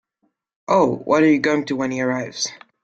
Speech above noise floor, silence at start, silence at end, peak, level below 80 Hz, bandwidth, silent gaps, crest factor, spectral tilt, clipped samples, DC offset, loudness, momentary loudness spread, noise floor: 52 dB; 0.7 s; 0.25 s; -4 dBFS; -62 dBFS; 8.8 kHz; none; 16 dB; -4.5 dB/octave; under 0.1%; under 0.1%; -19 LUFS; 10 LU; -70 dBFS